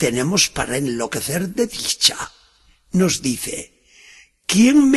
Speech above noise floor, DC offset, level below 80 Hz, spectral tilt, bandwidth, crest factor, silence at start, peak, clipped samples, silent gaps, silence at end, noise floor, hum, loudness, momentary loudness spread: 37 dB; under 0.1%; -48 dBFS; -3.5 dB/octave; 12.5 kHz; 20 dB; 0 s; 0 dBFS; under 0.1%; none; 0 s; -55 dBFS; none; -18 LUFS; 13 LU